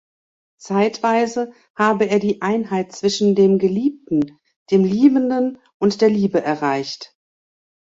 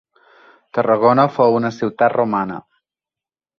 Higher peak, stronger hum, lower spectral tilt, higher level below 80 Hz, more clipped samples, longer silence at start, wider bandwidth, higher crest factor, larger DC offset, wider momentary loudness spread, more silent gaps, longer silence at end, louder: about the same, -2 dBFS vs -2 dBFS; neither; second, -6 dB/octave vs -8 dB/octave; about the same, -62 dBFS vs -62 dBFS; neither; about the same, 0.65 s vs 0.75 s; first, 7.8 kHz vs 6.8 kHz; about the same, 16 dB vs 16 dB; neither; second, 9 LU vs 12 LU; first, 1.70-1.74 s, 4.56-4.66 s, 5.74-5.80 s vs none; second, 0.85 s vs 1 s; about the same, -18 LUFS vs -17 LUFS